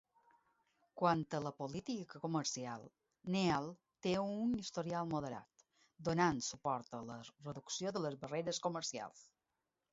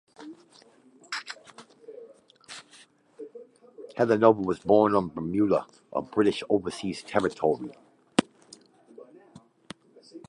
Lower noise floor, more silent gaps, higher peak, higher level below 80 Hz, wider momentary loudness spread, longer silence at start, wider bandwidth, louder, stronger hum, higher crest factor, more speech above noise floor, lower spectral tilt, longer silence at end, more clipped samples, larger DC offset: first, -89 dBFS vs -57 dBFS; neither; second, -20 dBFS vs -4 dBFS; second, -72 dBFS vs -62 dBFS; second, 14 LU vs 26 LU; first, 0.95 s vs 0.2 s; second, 7.6 kHz vs 11 kHz; second, -40 LUFS vs -26 LUFS; neither; about the same, 22 dB vs 26 dB; first, 49 dB vs 32 dB; about the same, -5 dB/octave vs -6 dB/octave; first, 0.7 s vs 0.1 s; neither; neither